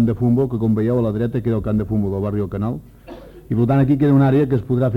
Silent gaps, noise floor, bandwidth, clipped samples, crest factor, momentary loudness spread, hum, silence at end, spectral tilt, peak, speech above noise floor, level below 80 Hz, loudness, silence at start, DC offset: none; -38 dBFS; 4.7 kHz; under 0.1%; 12 dB; 10 LU; none; 0 s; -10.5 dB/octave; -6 dBFS; 21 dB; -40 dBFS; -18 LUFS; 0 s; under 0.1%